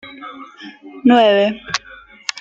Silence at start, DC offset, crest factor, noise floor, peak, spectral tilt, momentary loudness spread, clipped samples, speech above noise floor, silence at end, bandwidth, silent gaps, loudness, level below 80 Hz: 0.05 s; under 0.1%; 16 dB; -42 dBFS; -2 dBFS; -4 dB/octave; 24 LU; under 0.1%; 26 dB; 0 s; 8 kHz; none; -15 LUFS; -58 dBFS